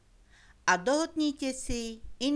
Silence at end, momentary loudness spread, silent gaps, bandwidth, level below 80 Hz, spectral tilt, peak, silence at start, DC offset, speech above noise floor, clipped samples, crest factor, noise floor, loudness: 0 s; 9 LU; none; 11 kHz; -48 dBFS; -3 dB/octave; -10 dBFS; 0.65 s; under 0.1%; 29 dB; under 0.1%; 22 dB; -59 dBFS; -30 LUFS